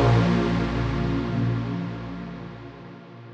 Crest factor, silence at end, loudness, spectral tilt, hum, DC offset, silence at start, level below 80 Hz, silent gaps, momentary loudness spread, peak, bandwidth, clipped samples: 16 dB; 0 s; -25 LUFS; -8 dB/octave; 60 Hz at -45 dBFS; under 0.1%; 0 s; -38 dBFS; none; 20 LU; -8 dBFS; 7.6 kHz; under 0.1%